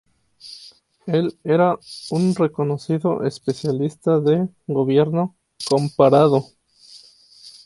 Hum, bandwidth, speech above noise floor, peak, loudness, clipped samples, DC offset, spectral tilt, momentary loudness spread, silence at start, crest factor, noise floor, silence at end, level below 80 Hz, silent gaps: none; 11.5 kHz; 29 dB; -2 dBFS; -20 LUFS; under 0.1%; under 0.1%; -7.5 dB/octave; 13 LU; 0.45 s; 18 dB; -48 dBFS; 0.15 s; -62 dBFS; none